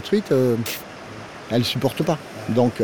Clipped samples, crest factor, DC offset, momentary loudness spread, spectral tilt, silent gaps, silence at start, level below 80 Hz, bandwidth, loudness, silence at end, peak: under 0.1%; 16 dB; under 0.1%; 17 LU; -6 dB/octave; none; 0 s; -56 dBFS; over 20 kHz; -22 LUFS; 0 s; -6 dBFS